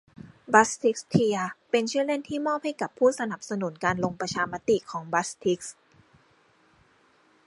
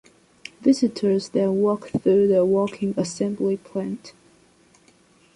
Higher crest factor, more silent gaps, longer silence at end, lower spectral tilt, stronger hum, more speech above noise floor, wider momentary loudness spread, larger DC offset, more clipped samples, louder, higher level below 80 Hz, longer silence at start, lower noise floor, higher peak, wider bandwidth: first, 26 dB vs 16 dB; neither; first, 1.75 s vs 1.25 s; second, -4.5 dB/octave vs -6.5 dB/octave; neither; about the same, 36 dB vs 36 dB; about the same, 10 LU vs 12 LU; neither; neither; second, -26 LUFS vs -22 LUFS; about the same, -64 dBFS vs -62 dBFS; second, 0.25 s vs 0.6 s; first, -62 dBFS vs -57 dBFS; first, -2 dBFS vs -8 dBFS; about the same, 11.5 kHz vs 11 kHz